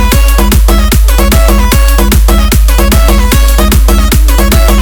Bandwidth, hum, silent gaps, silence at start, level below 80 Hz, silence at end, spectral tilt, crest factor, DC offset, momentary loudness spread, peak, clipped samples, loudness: over 20 kHz; none; none; 0 s; -6 dBFS; 0 s; -4.5 dB/octave; 4 dB; under 0.1%; 1 LU; 0 dBFS; 0.7%; -7 LUFS